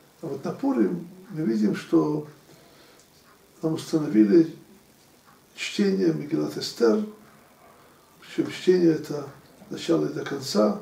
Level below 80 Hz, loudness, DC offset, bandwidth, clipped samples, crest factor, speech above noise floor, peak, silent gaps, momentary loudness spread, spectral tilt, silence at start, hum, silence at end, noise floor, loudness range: -70 dBFS; -25 LUFS; under 0.1%; 15.5 kHz; under 0.1%; 18 dB; 32 dB; -8 dBFS; none; 14 LU; -6 dB/octave; 0.25 s; none; 0 s; -56 dBFS; 3 LU